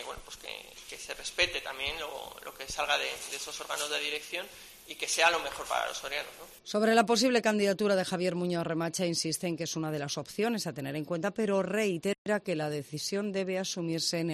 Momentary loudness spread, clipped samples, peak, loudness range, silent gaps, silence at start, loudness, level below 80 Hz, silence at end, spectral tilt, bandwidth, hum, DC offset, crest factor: 16 LU; under 0.1%; -10 dBFS; 5 LU; 12.18-12.25 s; 0 s; -31 LUFS; -62 dBFS; 0 s; -3.5 dB/octave; 13.5 kHz; none; under 0.1%; 22 dB